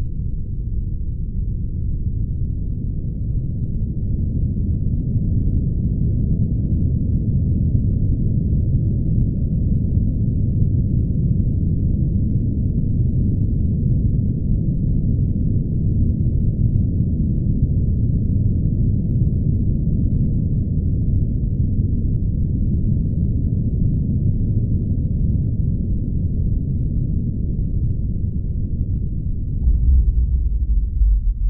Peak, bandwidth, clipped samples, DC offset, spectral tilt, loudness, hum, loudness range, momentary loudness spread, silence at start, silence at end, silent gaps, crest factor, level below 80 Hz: -4 dBFS; 0.8 kHz; under 0.1%; under 0.1%; -18 dB/octave; -21 LUFS; none; 3 LU; 5 LU; 0 s; 0 s; none; 14 dB; -22 dBFS